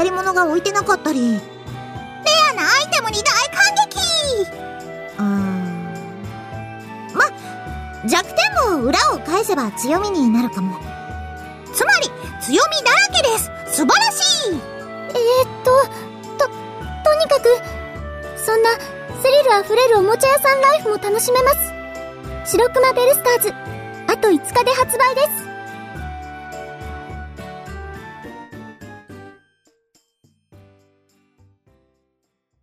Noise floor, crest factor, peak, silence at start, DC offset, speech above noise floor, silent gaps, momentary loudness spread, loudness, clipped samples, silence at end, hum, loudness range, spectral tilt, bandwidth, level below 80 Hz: -72 dBFS; 16 dB; -4 dBFS; 0 s; under 0.1%; 56 dB; none; 19 LU; -16 LUFS; under 0.1%; 3.3 s; none; 8 LU; -3 dB/octave; 15.5 kHz; -42 dBFS